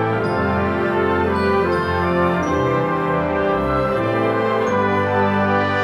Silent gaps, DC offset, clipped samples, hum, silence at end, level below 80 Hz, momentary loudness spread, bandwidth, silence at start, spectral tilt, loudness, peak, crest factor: none; under 0.1%; under 0.1%; none; 0 s; -40 dBFS; 2 LU; 12.5 kHz; 0 s; -7.5 dB/octave; -18 LUFS; -6 dBFS; 12 dB